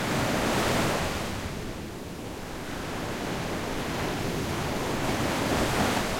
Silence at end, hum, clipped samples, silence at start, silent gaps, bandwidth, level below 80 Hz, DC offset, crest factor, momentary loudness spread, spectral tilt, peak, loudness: 0 s; none; under 0.1%; 0 s; none; 16.5 kHz; -42 dBFS; under 0.1%; 16 dB; 12 LU; -4.5 dB/octave; -14 dBFS; -29 LUFS